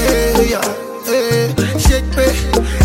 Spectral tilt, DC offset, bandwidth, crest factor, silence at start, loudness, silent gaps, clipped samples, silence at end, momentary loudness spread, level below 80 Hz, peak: -5 dB/octave; under 0.1%; 16.5 kHz; 14 dB; 0 s; -15 LUFS; none; under 0.1%; 0 s; 5 LU; -20 dBFS; 0 dBFS